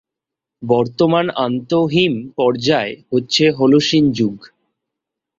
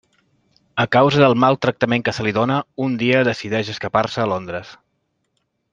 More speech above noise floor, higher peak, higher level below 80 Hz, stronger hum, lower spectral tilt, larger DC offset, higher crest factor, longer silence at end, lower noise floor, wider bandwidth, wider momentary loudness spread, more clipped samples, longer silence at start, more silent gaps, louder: first, 69 dB vs 53 dB; about the same, -2 dBFS vs -2 dBFS; about the same, -54 dBFS vs -56 dBFS; neither; about the same, -5.5 dB/octave vs -6.5 dB/octave; neither; about the same, 16 dB vs 18 dB; about the same, 0.95 s vs 1 s; first, -84 dBFS vs -71 dBFS; second, 7.8 kHz vs 9 kHz; about the same, 8 LU vs 10 LU; neither; second, 0.6 s vs 0.75 s; neither; about the same, -16 LUFS vs -18 LUFS